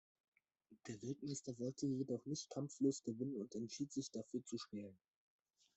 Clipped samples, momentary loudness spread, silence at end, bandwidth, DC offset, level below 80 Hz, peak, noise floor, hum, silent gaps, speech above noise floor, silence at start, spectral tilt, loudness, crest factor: under 0.1%; 11 LU; 0.8 s; 8.2 kHz; under 0.1%; -84 dBFS; -26 dBFS; -72 dBFS; none; none; 27 dB; 0.7 s; -5.5 dB/octave; -46 LUFS; 20 dB